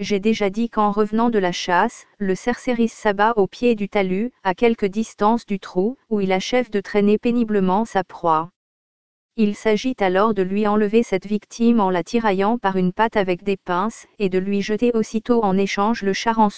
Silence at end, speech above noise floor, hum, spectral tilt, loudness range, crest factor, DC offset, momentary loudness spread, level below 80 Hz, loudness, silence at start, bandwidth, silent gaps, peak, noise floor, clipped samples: 0 s; over 71 dB; none; -6 dB/octave; 2 LU; 16 dB; 1%; 5 LU; -50 dBFS; -20 LUFS; 0 s; 8 kHz; 8.56-9.29 s; -4 dBFS; under -90 dBFS; under 0.1%